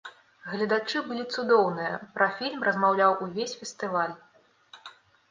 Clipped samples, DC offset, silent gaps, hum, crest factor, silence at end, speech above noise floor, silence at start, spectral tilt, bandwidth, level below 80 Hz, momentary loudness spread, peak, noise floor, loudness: under 0.1%; under 0.1%; none; none; 20 dB; 0.4 s; 29 dB; 0.05 s; -4.5 dB/octave; 9.6 kHz; -76 dBFS; 23 LU; -8 dBFS; -55 dBFS; -27 LUFS